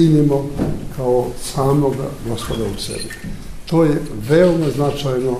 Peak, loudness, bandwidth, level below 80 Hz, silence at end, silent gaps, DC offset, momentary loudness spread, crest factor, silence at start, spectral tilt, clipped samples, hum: -2 dBFS; -18 LUFS; 15.5 kHz; -34 dBFS; 0 s; none; under 0.1%; 12 LU; 16 dB; 0 s; -6.5 dB/octave; under 0.1%; none